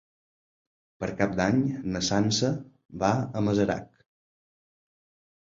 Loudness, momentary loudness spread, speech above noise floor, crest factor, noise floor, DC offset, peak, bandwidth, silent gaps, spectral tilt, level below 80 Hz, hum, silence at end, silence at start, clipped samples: -27 LUFS; 11 LU; over 64 dB; 22 dB; under -90 dBFS; under 0.1%; -8 dBFS; 7.8 kHz; 2.85-2.89 s; -5 dB/octave; -54 dBFS; none; 1.75 s; 1 s; under 0.1%